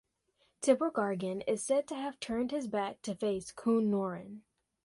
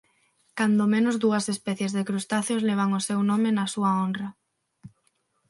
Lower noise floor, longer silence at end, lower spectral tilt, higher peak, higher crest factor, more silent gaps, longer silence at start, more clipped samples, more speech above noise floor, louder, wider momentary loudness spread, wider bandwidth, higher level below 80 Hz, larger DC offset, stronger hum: first, -75 dBFS vs -71 dBFS; second, 0.45 s vs 0.6 s; about the same, -5 dB/octave vs -5 dB/octave; second, -14 dBFS vs -10 dBFS; about the same, 20 dB vs 16 dB; neither; about the same, 0.6 s vs 0.55 s; neither; second, 42 dB vs 47 dB; second, -33 LUFS vs -25 LUFS; first, 10 LU vs 6 LU; about the same, 11.5 kHz vs 11.5 kHz; about the same, -70 dBFS vs -72 dBFS; neither; neither